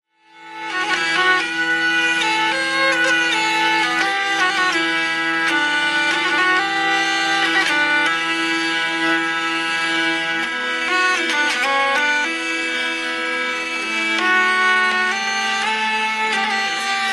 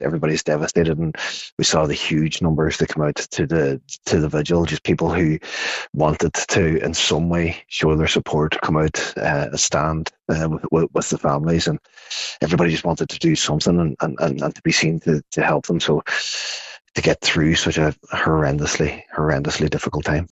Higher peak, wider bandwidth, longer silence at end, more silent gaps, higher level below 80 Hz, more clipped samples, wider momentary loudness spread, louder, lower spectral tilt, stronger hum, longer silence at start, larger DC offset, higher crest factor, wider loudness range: about the same, -4 dBFS vs -2 dBFS; first, 12.5 kHz vs 8.2 kHz; about the same, 0 s vs 0.05 s; second, none vs 1.52-1.57 s, 5.89-5.93 s; second, -60 dBFS vs -40 dBFS; neither; about the same, 5 LU vs 6 LU; first, -17 LUFS vs -20 LUFS; second, -1 dB/octave vs -4.5 dB/octave; neither; first, 0.35 s vs 0 s; neither; about the same, 14 dB vs 18 dB; about the same, 2 LU vs 1 LU